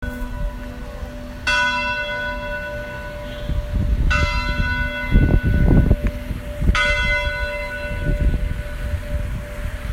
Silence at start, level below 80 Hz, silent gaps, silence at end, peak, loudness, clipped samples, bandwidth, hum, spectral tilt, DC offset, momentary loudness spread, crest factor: 0 s; -22 dBFS; none; 0 s; -2 dBFS; -22 LUFS; under 0.1%; 15 kHz; none; -6 dB/octave; under 0.1%; 13 LU; 18 dB